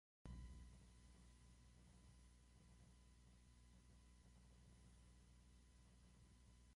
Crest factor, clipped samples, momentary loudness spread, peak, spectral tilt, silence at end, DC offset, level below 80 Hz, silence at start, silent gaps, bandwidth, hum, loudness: 22 dB; under 0.1%; 9 LU; -44 dBFS; -5 dB/octave; 0 s; under 0.1%; -68 dBFS; 0.25 s; none; 11.5 kHz; 60 Hz at -70 dBFS; -65 LUFS